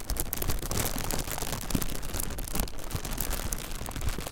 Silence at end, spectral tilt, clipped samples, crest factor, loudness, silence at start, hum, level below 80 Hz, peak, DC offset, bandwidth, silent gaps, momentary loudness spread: 0 s; -3.5 dB/octave; under 0.1%; 24 dB; -33 LUFS; 0 s; none; -34 dBFS; -6 dBFS; under 0.1%; 17 kHz; none; 5 LU